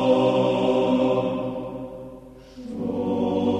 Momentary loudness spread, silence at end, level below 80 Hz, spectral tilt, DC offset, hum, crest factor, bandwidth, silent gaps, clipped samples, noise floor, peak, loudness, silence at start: 20 LU; 0 s; -52 dBFS; -7.5 dB/octave; under 0.1%; none; 16 dB; 9 kHz; none; under 0.1%; -43 dBFS; -8 dBFS; -23 LUFS; 0 s